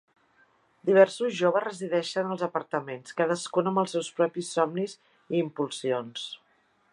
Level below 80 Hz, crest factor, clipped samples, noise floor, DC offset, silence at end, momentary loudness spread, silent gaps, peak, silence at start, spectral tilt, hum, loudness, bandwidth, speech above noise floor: -82 dBFS; 22 dB; under 0.1%; -67 dBFS; under 0.1%; 0.55 s; 12 LU; none; -6 dBFS; 0.85 s; -5 dB/octave; none; -28 LUFS; 11 kHz; 40 dB